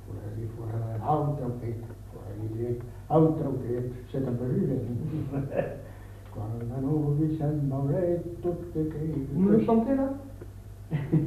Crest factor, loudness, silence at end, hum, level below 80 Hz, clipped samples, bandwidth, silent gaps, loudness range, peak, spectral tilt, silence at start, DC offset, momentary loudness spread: 18 dB; -29 LUFS; 0 s; none; -48 dBFS; under 0.1%; 14 kHz; none; 4 LU; -10 dBFS; -10 dB/octave; 0 s; under 0.1%; 16 LU